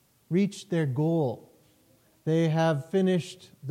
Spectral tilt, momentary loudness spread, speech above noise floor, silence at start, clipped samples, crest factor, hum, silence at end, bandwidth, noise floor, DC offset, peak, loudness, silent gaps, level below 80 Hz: -7.5 dB/octave; 13 LU; 37 dB; 0.3 s; under 0.1%; 12 dB; none; 0 s; 12 kHz; -63 dBFS; under 0.1%; -16 dBFS; -27 LUFS; none; -74 dBFS